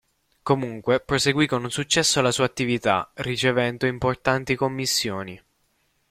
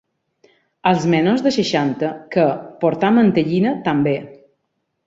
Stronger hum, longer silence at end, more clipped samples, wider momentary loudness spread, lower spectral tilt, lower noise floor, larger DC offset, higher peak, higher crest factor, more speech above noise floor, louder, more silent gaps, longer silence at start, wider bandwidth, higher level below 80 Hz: neither; about the same, 0.75 s vs 0.7 s; neither; about the same, 6 LU vs 7 LU; second, -3.5 dB/octave vs -6.5 dB/octave; second, -68 dBFS vs -72 dBFS; neither; about the same, -4 dBFS vs -2 dBFS; about the same, 20 dB vs 16 dB; second, 45 dB vs 56 dB; second, -23 LUFS vs -18 LUFS; neither; second, 0.45 s vs 0.85 s; first, 16 kHz vs 7.8 kHz; first, -52 dBFS vs -58 dBFS